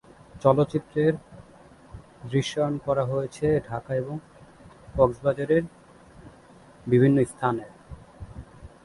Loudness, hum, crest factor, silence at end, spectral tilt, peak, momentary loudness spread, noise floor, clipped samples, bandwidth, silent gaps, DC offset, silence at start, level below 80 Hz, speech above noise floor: -25 LUFS; none; 22 dB; 0.2 s; -7.5 dB/octave; -4 dBFS; 22 LU; -51 dBFS; under 0.1%; 11.5 kHz; none; under 0.1%; 0.35 s; -50 dBFS; 28 dB